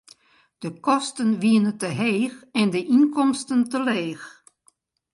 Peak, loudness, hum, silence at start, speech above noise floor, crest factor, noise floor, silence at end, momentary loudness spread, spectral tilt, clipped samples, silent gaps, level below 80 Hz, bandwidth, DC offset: -6 dBFS; -22 LUFS; none; 0.6 s; 42 dB; 16 dB; -64 dBFS; 0.85 s; 13 LU; -5 dB/octave; under 0.1%; none; -72 dBFS; 11.5 kHz; under 0.1%